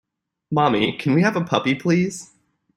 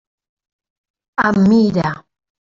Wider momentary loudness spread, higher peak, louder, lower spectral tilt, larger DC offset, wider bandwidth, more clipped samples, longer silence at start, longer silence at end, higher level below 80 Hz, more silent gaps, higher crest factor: second, 7 LU vs 14 LU; about the same, -2 dBFS vs -2 dBFS; second, -20 LUFS vs -15 LUFS; second, -6 dB/octave vs -7.5 dB/octave; neither; first, 12 kHz vs 7.4 kHz; neither; second, 0.5 s vs 1.2 s; about the same, 0.5 s vs 0.4 s; second, -60 dBFS vs -50 dBFS; neither; about the same, 20 dB vs 16 dB